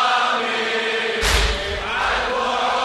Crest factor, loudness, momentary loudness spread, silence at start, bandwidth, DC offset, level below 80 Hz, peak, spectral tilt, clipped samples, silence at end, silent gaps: 16 dB; -20 LUFS; 4 LU; 0 s; 13 kHz; under 0.1%; -30 dBFS; -4 dBFS; -2.5 dB/octave; under 0.1%; 0 s; none